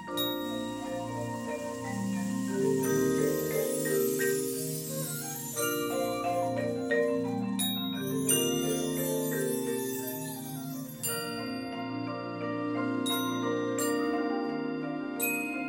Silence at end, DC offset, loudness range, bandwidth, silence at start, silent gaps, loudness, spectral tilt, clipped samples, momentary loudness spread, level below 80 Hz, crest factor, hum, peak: 0 s; under 0.1%; 4 LU; 17 kHz; 0 s; none; -31 LUFS; -4 dB/octave; under 0.1%; 8 LU; -66 dBFS; 18 dB; none; -14 dBFS